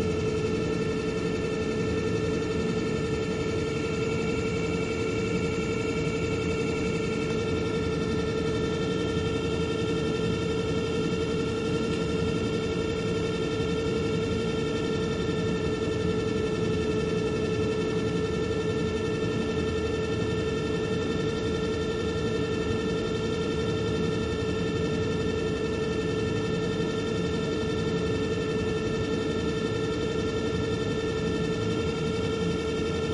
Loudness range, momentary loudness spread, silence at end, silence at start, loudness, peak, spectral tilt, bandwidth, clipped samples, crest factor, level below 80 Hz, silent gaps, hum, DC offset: 1 LU; 1 LU; 0 s; 0 s; -28 LUFS; -16 dBFS; -6 dB/octave; 11.5 kHz; under 0.1%; 12 dB; -44 dBFS; none; none; under 0.1%